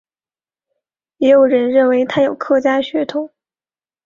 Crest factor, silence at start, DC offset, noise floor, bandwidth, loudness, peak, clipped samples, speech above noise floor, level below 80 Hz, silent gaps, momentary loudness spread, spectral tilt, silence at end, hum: 14 dB; 1.2 s; under 0.1%; under -90 dBFS; 7.2 kHz; -14 LUFS; -2 dBFS; under 0.1%; over 76 dB; -62 dBFS; none; 10 LU; -6 dB/octave; 0.8 s; none